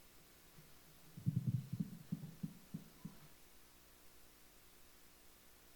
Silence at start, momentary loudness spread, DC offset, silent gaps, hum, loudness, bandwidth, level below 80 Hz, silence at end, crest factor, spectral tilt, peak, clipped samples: 0 s; 21 LU; under 0.1%; none; 60 Hz at -70 dBFS; -46 LUFS; 19 kHz; -72 dBFS; 0 s; 24 dB; -7 dB/octave; -24 dBFS; under 0.1%